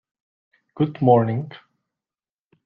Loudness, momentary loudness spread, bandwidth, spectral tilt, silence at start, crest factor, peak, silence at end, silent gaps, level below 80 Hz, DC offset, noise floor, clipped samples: -20 LUFS; 13 LU; 4.7 kHz; -11.5 dB/octave; 0.75 s; 22 dB; -2 dBFS; 1.1 s; none; -64 dBFS; under 0.1%; under -90 dBFS; under 0.1%